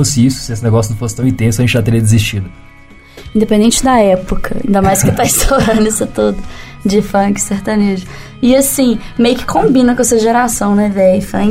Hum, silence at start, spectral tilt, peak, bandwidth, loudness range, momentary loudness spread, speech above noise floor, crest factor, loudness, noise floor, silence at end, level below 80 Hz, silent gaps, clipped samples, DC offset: none; 0 s; -5 dB/octave; 0 dBFS; 16.5 kHz; 2 LU; 8 LU; 26 dB; 12 dB; -12 LUFS; -37 dBFS; 0 s; -28 dBFS; none; under 0.1%; under 0.1%